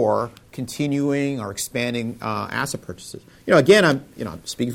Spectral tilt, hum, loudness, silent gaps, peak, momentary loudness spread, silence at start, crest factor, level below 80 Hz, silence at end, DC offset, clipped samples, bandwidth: -5 dB/octave; none; -21 LUFS; none; -4 dBFS; 19 LU; 0 s; 18 dB; -56 dBFS; 0 s; under 0.1%; under 0.1%; 17 kHz